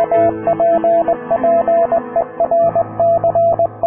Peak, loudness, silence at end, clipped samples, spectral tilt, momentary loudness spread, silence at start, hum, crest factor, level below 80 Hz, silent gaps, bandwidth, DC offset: -4 dBFS; -14 LUFS; 0 s; under 0.1%; -11 dB/octave; 3 LU; 0 s; none; 10 dB; -48 dBFS; none; 3.3 kHz; under 0.1%